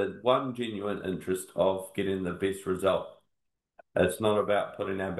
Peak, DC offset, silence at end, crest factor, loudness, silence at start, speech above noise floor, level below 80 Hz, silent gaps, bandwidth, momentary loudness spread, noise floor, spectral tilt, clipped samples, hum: -10 dBFS; under 0.1%; 0 s; 20 dB; -30 LUFS; 0 s; 53 dB; -66 dBFS; none; 12.5 kHz; 7 LU; -82 dBFS; -5.5 dB/octave; under 0.1%; none